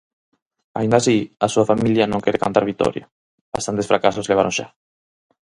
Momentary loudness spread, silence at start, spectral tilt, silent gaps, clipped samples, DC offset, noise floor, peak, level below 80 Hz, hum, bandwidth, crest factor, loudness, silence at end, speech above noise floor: 10 LU; 0.75 s; -5 dB/octave; 3.12-3.52 s; under 0.1%; under 0.1%; under -90 dBFS; 0 dBFS; -52 dBFS; none; 11.5 kHz; 20 dB; -19 LUFS; 0.9 s; over 72 dB